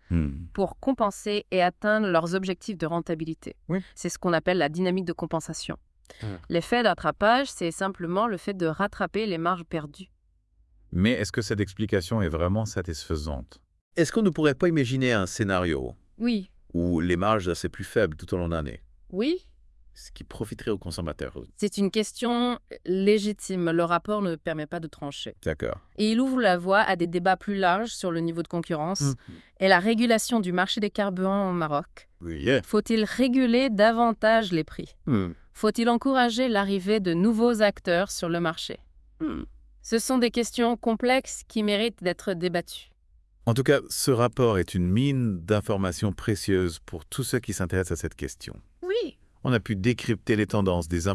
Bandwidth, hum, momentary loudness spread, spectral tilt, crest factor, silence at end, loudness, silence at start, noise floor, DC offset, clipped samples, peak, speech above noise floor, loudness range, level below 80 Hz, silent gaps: 12 kHz; none; 12 LU; -5.5 dB/octave; 22 dB; 0 s; -26 LUFS; 0.1 s; -64 dBFS; under 0.1%; under 0.1%; -4 dBFS; 39 dB; 5 LU; -50 dBFS; 13.81-13.91 s